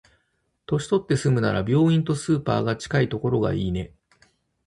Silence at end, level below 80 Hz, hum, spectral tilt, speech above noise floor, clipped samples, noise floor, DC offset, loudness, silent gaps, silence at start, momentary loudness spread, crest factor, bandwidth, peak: 0.8 s; -46 dBFS; none; -7 dB/octave; 50 dB; under 0.1%; -72 dBFS; under 0.1%; -23 LUFS; none; 0.7 s; 8 LU; 16 dB; 11.5 kHz; -8 dBFS